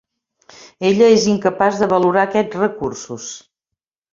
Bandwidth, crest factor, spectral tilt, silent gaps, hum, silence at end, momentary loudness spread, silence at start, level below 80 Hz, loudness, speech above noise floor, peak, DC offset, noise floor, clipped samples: 7.6 kHz; 16 dB; -5 dB/octave; none; none; 0.75 s; 17 LU; 0.8 s; -56 dBFS; -16 LUFS; 67 dB; -2 dBFS; under 0.1%; -83 dBFS; under 0.1%